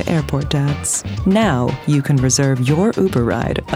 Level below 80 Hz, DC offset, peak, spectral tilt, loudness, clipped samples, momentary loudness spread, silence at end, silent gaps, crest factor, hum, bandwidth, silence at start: -34 dBFS; under 0.1%; -2 dBFS; -5.5 dB/octave; -17 LUFS; under 0.1%; 4 LU; 0 s; none; 14 dB; none; 15 kHz; 0 s